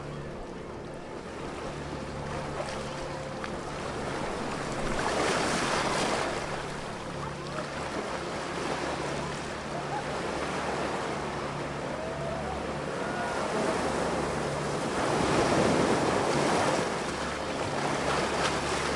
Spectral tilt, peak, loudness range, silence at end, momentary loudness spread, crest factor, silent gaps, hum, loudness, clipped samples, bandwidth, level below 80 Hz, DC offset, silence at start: -4.5 dB/octave; -12 dBFS; 8 LU; 0 s; 11 LU; 18 dB; none; none; -31 LUFS; under 0.1%; 11.5 kHz; -48 dBFS; under 0.1%; 0 s